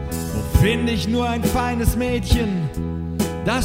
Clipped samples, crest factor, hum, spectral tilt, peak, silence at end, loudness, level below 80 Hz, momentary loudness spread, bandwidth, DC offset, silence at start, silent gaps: under 0.1%; 18 dB; none; -5.5 dB/octave; -2 dBFS; 0 s; -21 LUFS; -28 dBFS; 7 LU; 16.5 kHz; under 0.1%; 0 s; none